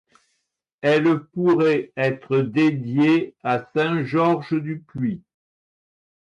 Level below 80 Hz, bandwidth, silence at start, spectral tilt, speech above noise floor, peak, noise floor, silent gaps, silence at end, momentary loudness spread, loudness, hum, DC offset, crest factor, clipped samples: -64 dBFS; 7.6 kHz; 0.85 s; -8 dB/octave; 55 dB; -8 dBFS; -76 dBFS; none; 1.15 s; 9 LU; -21 LUFS; none; under 0.1%; 14 dB; under 0.1%